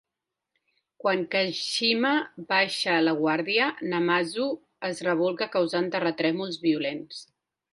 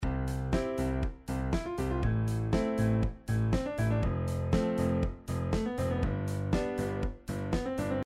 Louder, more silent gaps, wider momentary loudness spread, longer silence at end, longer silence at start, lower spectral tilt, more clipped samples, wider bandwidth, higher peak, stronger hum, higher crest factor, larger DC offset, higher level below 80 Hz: first, -26 LUFS vs -32 LUFS; neither; first, 8 LU vs 5 LU; first, 0.5 s vs 0 s; first, 1.05 s vs 0 s; second, -4.5 dB/octave vs -7.5 dB/octave; neither; second, 11.5 kHz vs 14.5 kHz; first, -8 dBFS vs -16 dBFS; neither; about the same, 18 dB vs 14 dB; neither; second, -74 dBFS vs -38 dBFS